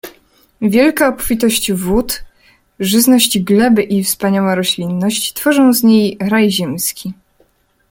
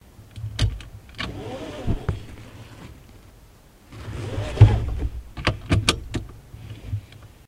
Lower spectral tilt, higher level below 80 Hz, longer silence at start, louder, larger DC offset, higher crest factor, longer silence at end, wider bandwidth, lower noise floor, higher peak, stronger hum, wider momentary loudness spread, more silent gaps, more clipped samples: second, -4 dB/octave vs -5.5 dB/octave; second, -40 dBFS vs -34 dBFS; second, 0.05 s vs 0.2 s; first, -13 LUFS vs -25 LUFS; neither; second, 14 dB vs 26 dB; first, 0.75 s vs 0.2 s; first, 17 kHz vs 13.5 kHz; first, -56 dBFS vs -50 dBFS; about the same, 0 dBFS vs 0 dBFS; neither; second, 9 LU vs 25 LU; neither; neither